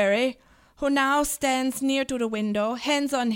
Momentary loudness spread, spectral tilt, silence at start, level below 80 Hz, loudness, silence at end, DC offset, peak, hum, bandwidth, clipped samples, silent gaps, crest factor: 5 LU; -3 dB/octave; 0 s; -54 dBFS; -25 LUFS; 0 s; under 0.1%; -10 dBFS; none; 17 kHz; under 0.1%; none; 14 dB